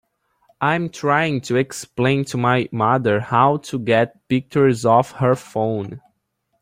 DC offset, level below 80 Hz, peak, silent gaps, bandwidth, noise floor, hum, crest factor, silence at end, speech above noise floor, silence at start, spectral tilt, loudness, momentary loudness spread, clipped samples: under 0.1%; -56 dBFS; -2 dBFS; none; 15.5 kHz; -71 dBFS; none; 18 dB; 0.65 s; 52 dB; 0.6 s; -6 dB/octave; -19 LUFS; 7 LU; under 0.1%